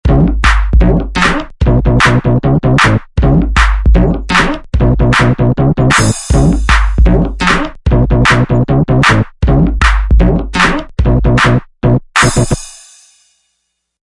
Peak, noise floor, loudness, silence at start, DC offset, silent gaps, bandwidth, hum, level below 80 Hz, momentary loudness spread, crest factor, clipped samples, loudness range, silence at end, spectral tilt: 0 dBFS; -67 dBFS; -11 LUFS; 0.05 s; under 0.1%; none; 11.5 kHz; none; -14 dBFS; 4 LU; 10 dB; 0.2%; 1 LU; 1.4 s; -5.5 dB/octave